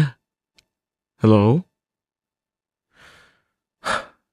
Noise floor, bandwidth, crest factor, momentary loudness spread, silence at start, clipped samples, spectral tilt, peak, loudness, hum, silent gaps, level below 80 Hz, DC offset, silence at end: under -90 dBFS; 11.5 kHz; 20 dB; 11 LU; 0 s; under 0.1%; -7.5 dB/octave; -4 dBFS; -20 LUFS; none; none; -60 dBFS; under 0.1%; 0.3 s